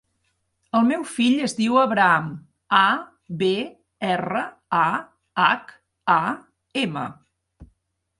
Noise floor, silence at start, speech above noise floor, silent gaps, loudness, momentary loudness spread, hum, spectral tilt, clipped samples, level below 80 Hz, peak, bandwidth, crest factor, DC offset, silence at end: -72 dBFS; 0.75 s; 51 dB; none; -22 LUFS; 13 LU; none; -5 dB/octave; under 0.1%; -62 dBFS; -2 dBFS; 11.5 kHz; 22 dB; under 0.1%; 0.55 s